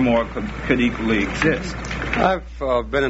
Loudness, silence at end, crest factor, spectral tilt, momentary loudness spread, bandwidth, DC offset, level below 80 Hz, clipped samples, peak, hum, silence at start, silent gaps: -21 LUFS; 0 s; 16 dB; -4.5 dB/octave; 8 LU; 8 kHz; under 0.1%; -34 dBFS; under 0.1%; -4 dBFS; none; 0 s; none